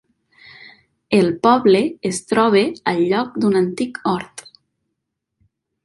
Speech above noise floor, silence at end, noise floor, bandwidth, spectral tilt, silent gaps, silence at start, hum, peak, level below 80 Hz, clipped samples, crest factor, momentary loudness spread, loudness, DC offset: 61 dB; 1.45 s; -78 dBFS; 11.5 kHz; -5.5 dB/octave; none; 1.1 s; none; -2 dBFS; -58 dBFS; under 0.1%; 18 dB; 9 LU; -17 LUFS; under 0.1%